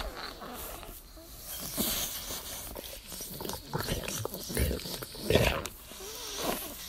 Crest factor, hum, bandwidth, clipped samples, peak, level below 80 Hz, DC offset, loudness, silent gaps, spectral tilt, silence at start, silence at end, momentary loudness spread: 28 dB; none; 16 kHz; under 0.1%; -8 dBFS; -44 dBFS; under 0.1%; -34 LUFS; none; -3.5 dB/octave; 0 s; 0 s; 13 LU